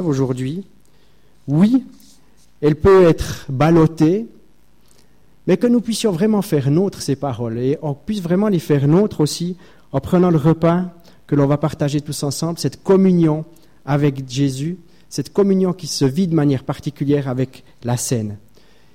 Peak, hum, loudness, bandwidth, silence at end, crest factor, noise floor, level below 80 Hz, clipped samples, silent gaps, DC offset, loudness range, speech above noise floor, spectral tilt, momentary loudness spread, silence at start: -4 dBFS; none; -18 LUFS; 16 kHz; 0.6 s; 14 dB; -55 dBFS; -44 dBFS; under 0.1%; none; 0.5%; 3 LU; 39 dB; -7 dB/octave; 13 LU; 0 s